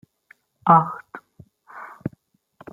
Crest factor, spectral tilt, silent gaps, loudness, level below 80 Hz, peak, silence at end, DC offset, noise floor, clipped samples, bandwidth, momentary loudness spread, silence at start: 24 dB; -9.5 dB/octave; none; -19 LUFS; -64 dBFS; -2 dBFS; 0.65 s; under 0.1%; -59 dBFS; under 0.1%; 4 kHz; 26 LU; 0.65 s